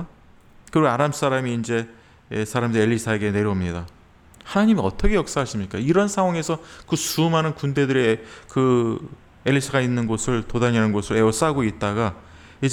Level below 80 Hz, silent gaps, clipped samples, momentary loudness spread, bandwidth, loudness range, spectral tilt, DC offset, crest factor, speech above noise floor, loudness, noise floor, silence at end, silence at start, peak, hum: -38 dBFS; none; under 0.1%; 9 LU; 20 kHz; 2 LU; -5.5 dB/octave; under 0.1%; 16 dB; 29 dB; -22 LUFS; -50 dBFS; 0 s; 0 s; -6 dBFS; none